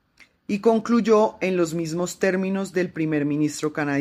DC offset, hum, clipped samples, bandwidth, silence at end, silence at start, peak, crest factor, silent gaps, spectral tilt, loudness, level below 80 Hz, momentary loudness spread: under 0.1%; none; under 0.1%; 15.5 kHz; 0 s; 0.5 s; -6 dBFS; 16 dB; none; -6 dB/octave; -23 LUFS; -62 dBFS; 7 LU